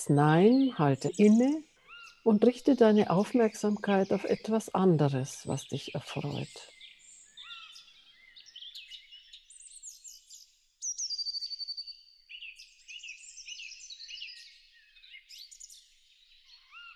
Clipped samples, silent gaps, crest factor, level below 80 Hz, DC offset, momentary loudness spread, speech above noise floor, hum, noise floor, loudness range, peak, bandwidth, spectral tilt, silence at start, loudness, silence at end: under 0.1%; none; 20 dB; -72 dBFS; under 0.1%; 26 LU; 37 dB; none; -63 dBFS; 21 LU; -10 dBFS; 12.5 kHz; -5.5 dB/octave; 0 s; -28 LUFS; 0.05 s